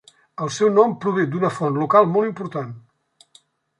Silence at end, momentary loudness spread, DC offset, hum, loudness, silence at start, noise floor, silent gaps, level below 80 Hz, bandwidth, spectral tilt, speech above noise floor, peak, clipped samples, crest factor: 1 s; 14 LU; under 0.1%; none; -20 LUFS; 0.4 s; -58 dBFS; none; -68 dBFS; 11 kHz; -6.5 dB/octave; 39 dB; -2 dBFS; under 0.1%; 18 dB